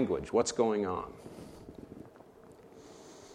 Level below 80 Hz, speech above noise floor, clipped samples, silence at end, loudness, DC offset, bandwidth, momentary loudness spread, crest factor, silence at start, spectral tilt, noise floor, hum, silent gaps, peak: -62 dBFS; 24 dB; under 0.1%; 0 s; -32 LUFS; under 0.1%; 13 kHz; 24 LU; 20 dB; 0 s; -5 dB/octave; -55 dBFS; none; none; -14 dBFS